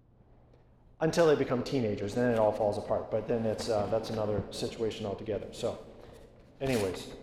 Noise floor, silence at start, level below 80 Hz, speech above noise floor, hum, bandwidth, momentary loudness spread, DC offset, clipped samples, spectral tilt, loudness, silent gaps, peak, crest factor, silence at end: -60 dBFS; 1 s; -54 dBFS; 29 dB; none; 15.5 kHz; 11 LU; under 0.1%; under 0.1%; -6 dB/octave; -31 LUFS; none; -14 dBFS; 18 dB; 0 s